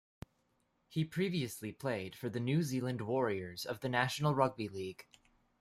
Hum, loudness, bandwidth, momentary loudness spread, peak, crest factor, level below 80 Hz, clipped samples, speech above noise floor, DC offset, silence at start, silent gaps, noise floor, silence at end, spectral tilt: none; -36 LUFS; 15.5 kHz; 12 LU; -14 dBFS; 22 dB; -70 dBFS; under 0.1%; 42 dB; under 0.1%; 0.9 s; none; -77 dBFS; 0.6 s; -6 dB/octave